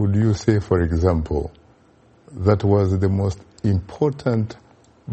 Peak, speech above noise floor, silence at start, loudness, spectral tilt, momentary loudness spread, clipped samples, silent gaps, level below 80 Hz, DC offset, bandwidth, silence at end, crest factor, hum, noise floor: -2 dBFS; 35 dB; 0 s; -21 LUFS; -8.5 dB/octave; 8 LU; under 0.1%; none; -36 dBFS; under 0.1%; 8.4 kHz; 0 s; 18 dB; none; -54 dBFS